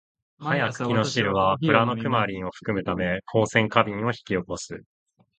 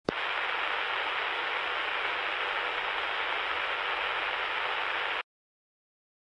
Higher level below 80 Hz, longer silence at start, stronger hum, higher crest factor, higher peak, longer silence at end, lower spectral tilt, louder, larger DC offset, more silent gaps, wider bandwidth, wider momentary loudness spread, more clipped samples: first, -52 dBFS vs -66 dBFS; first, 0.4 s vs 0.1 s; neither; about the same, 24 dB vs 24 dB; first, -2 dBFS vs -10 dBFS; second, 0.6 s vs 1 s; first, -5.5 dB/octave vs -2.5 dB/octave; first, -24 LUFS vs -30 LUFS; neither; neither; second, 9.2 kHz vs 11.5 kHz; first, 12 LU vs 1 LU; neither